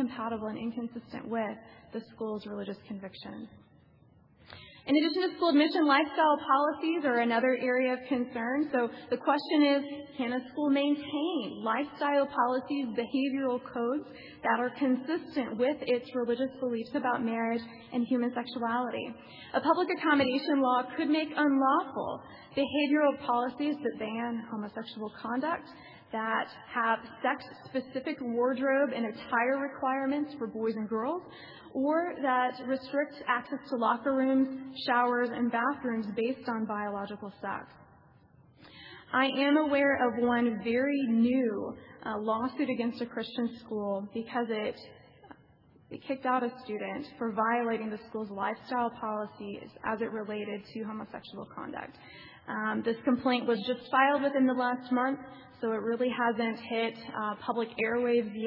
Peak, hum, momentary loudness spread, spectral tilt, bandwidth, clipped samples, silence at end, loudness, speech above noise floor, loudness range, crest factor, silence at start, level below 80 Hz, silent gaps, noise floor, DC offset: -12 dBFS; none; 14 LU; -8 dB/octave; 5.6 kHz; under 0.1%; 0 s; -31 LUFS; 31 dB; 8 LU; 18 dB; 0 s; -74 dBFS; none; -61 dBFS; under 0.1%